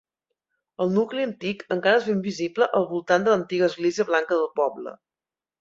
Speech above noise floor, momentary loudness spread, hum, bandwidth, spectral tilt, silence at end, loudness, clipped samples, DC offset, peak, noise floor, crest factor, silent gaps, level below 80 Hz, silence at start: over 67 dB; 8 LU; none; 7.8 kHz; -5.5 dB/octave; 0.65 s; -23 LUFS; under 0.1%; under 0.1%; -6 dBFS; under -90 dBFS; 18 dB; none; -70 dBFS; 0.8 s